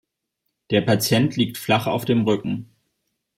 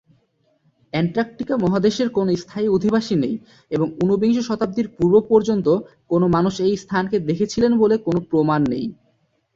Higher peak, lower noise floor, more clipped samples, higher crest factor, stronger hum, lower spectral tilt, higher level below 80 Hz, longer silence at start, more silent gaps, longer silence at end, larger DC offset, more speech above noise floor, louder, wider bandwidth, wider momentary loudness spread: about the same, -4 dBFS vs -4 dBFS; first, -78 dBFS vs -64 dBFS; neither; about the same, 18 dB vs 16 dB; neither; second, -5.5 dB/octave vs -7 dB/octave; second, -58 dBFS vs -52 dBFS; second, 0.7 s vs 0.95 s; neither; about the same, 0.75 s vs 0.65 s; neither; first, 57 dB vs 46 dB; about the same, -21 LUFS vs -20 LUFS; first, 16.5 kHz vs 7.8 kHz; about the same, 6 LU vs 7 LU